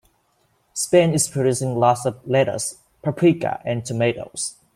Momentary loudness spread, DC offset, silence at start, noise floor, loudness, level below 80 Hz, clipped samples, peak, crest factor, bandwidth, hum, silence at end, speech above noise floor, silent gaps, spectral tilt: 11 LU; under 0.1%; 0.75 s; -65 dBFS; -21 LUFS; -58 dBFS; under 0.1%; -4 dBFS; 18 dB; 15.5 kHz; none; 0.25 s; 45 dB; none; -5 dB/octave